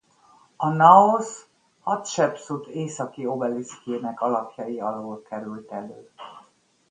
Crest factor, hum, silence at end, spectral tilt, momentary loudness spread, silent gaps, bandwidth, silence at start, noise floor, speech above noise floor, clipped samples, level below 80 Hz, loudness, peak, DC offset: 24 dB; none; 0.5 s; -5.5 dB/octave; 22 LU; none; 9.8 kHz; 0.6 s; -59 dBFS; 36 dB; under 0.1%; -72 dBFS; -22 LUFS; 0 dBFS; under 0.1%